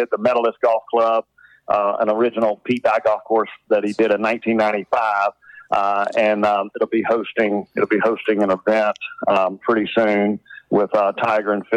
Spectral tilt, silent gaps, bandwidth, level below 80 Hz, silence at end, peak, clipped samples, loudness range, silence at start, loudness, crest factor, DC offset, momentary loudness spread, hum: -6.5 dB/octave; none; 9.6 kHz; -66 dBFS; 0 s; -6 dBFS; under 0.1%; 1 LU; 0 s; -19 LUFS; 12 dB; under 0.1%; 4 LU; none